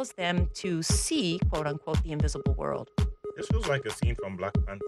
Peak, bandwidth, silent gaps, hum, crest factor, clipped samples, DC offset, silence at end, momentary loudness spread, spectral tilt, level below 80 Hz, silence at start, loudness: -14 dBFS; 12.5 kHz; none; none; 16 dB; under 0.1%; under 0.1%; 0 s; 5 LU; -5 dB/octave; -34 dBFS; 0 s; -30 LUFS